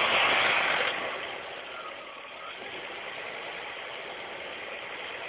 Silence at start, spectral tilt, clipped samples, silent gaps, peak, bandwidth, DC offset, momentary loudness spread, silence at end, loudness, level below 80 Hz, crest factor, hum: 0 s; 1.5 dB/octave; under 0.1%; none; -12 dBFS; 4 kHz; under 0.1%; 17 LU; 0 s; -30 LUFS; -68 dBFS; 20 dB; none